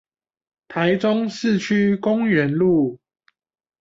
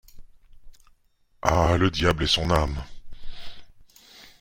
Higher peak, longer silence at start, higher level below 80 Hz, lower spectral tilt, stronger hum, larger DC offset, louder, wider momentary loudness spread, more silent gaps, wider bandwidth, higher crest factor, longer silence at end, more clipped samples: second, -6 dBFS vs -2 dBFS; first, 0.7 s vs 0.15 s; second, -60 dBFS vs -38 dBFS; first, -7 dB/octave vs -5 dB/octave; neither; neither; first, -19 LUFS vs -23 LUFS; second, 4 LU vs 23 LU; neither; second, 7.6 kHz vs 16 kHz; second, 16 dB vs 24 dB; first, 0.85 s vs 0.2 s; neither